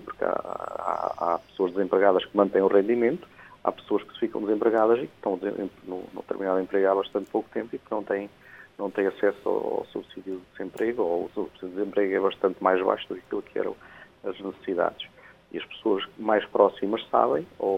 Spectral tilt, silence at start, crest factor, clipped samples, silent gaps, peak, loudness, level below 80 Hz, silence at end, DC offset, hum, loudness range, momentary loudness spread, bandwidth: -7 dB/octave; 0 s; 22 dB; under 0.1%; none; -6 dBFS; -27 LUFS; -66 dBFS; 0 s; under 0.1%; none; 5 LU; 15 LU; 8 kHz